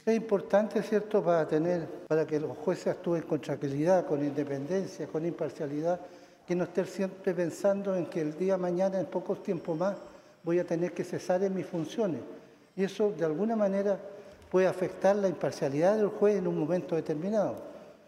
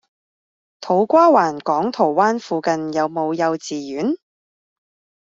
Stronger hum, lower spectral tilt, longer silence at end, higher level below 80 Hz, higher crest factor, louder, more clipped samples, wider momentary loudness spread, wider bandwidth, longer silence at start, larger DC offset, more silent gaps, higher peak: neither; first, -7 dB/octave vs -5.5 dB/octave; second, 0.15 s vs 1.1 s; second, -74 dBFS vs -66 dBFS; about the same, 18 dB vs 18 dB; second, -30 LUFS vs -18 LUFS; neither; second, 8 LU vs 12 LU; first, 14 kHz vs 7.8 kHz; second, 0.05 s vs 0.8 s; neither; neither; second, -12 dBFS vs -2 dBFS